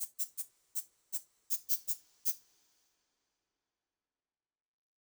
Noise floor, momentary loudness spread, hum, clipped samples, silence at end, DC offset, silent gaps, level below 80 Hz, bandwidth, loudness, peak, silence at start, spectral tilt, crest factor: under -90 dBFS; 8 LU; none; under 0.1%; 2.65 s; under 0.1%; none; -88 dBFS; over 20 kHz; -37 LUFS; -16 dBFS; 0 s; 3.5 dB/octave; 26 dB